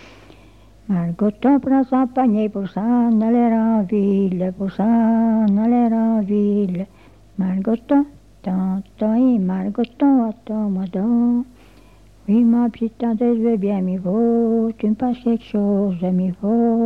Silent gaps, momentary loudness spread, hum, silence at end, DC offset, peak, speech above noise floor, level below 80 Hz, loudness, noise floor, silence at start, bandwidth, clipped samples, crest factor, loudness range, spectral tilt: none; 7 LU; none; 0 s; 0.2%; -6 dBFS; 30 dB; -52 dBFS; -19 LUFS; -48 dBFS; 0.9 s; 4.3 kHz; under 0.1%; 12 dB; 3 LU; -10.5 dB/octave